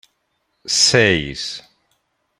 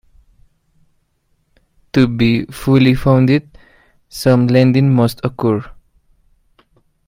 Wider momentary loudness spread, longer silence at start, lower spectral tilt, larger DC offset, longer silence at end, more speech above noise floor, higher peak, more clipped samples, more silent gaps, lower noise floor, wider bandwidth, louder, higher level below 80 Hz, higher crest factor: first, 21 LU vs 7 LU; second, 0.65 s vs 1.95 s; second, -2.5 dB/octave vs -7.5 dB/octave; neither; second, 0.8 s vs 1.35 s; about the same, 52 dB vs 50 dB; about the same, -2 dBFS vs 0 dBFS; neither; neither; first, -69 dBFS vs -63 dBFS; about the same, 16 kHz vs 16 kHz; about the same, -15 LUFS vs -14 LUFS; second, -48 dBFS vs -40 dBFS; about the same, 20 dB vs 16 dB